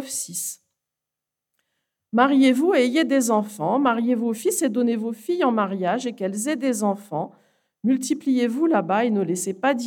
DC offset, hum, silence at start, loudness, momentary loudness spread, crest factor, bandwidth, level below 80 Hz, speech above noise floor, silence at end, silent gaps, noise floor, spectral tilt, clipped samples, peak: under 0.1%; 60 Hz at -45 dBFS; 0 s; -22 LUFS; 9 LU; 18 dB; 17.5 kHz; -84 dBFS; 65 dB; 0 s; none; -86 dBFS; -4.5 dB/octave; under 0.1%; -4 dBFS